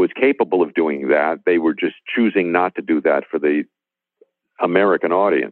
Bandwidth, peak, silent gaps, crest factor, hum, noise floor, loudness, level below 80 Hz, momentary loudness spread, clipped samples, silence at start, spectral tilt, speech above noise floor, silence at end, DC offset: 4.2 kHz; -2 dBFS; none; 18 dB; none; -58 dBFS; -18 LUFS; -68 dBFS; 5 LU; under 0.1%; 0 s; -9.5 dB/octave; 41 dB; 0 s; under 0.1%